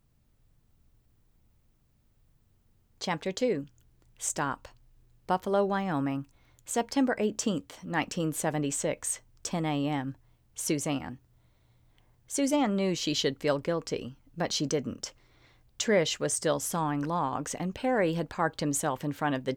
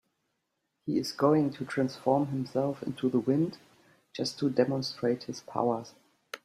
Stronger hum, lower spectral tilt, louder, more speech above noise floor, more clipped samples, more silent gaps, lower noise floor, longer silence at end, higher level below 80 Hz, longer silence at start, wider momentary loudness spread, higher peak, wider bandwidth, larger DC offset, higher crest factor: neither; second, -4 dB/octave vs -6.5 dB/octave; about the same, -30 LUFS vs -30 LUFS; second, 37 dB vs 52 dB; neither; neither; second, -67 dBFS vs -81 dBFS; about the same, 0 s vs 0.05 s; first, -62 dBFS vs -72 dBFS; first, 3 s vs 0.85 s; about the same, 10 LU vs 10 LU; second, -14 dBFS vs -10 dBFS; first, 18.5 kHz vs 14 kHz; neither; about the same, 18 dB vs 20 dB